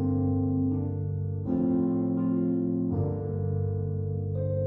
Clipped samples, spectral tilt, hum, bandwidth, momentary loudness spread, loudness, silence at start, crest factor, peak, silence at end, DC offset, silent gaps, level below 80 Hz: under 0.1%; -14 dB/octave; none; 1.9 kHz; 5 LU; -29 LUFS; 0 s; 12 dB; -16 dBFS; 0 s; under 0.1%; none; -52 dBFS